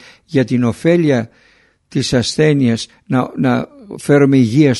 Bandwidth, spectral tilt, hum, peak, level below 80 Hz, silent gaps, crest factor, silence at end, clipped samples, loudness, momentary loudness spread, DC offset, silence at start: 11.5 kHz; -6.5 dB/octave; none; 0 dBFS; -48 dBFS; none; 14 dB; 0 s; under 0.1%; -15 LUFS; 11 LU; under 0.1%; 0.3 s